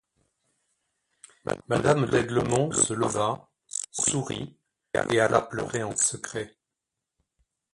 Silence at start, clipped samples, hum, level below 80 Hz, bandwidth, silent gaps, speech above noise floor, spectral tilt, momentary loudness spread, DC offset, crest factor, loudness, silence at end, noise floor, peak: 1.45 s; under 0.1%; none; -56 dBFS; 11.5 kHz; none; 60 dB; -4 dB/octave; 13 LU; under 0.1%; 22 dB; -26 LUFS; 1.25 s; -86 dBFS; -6 dBFS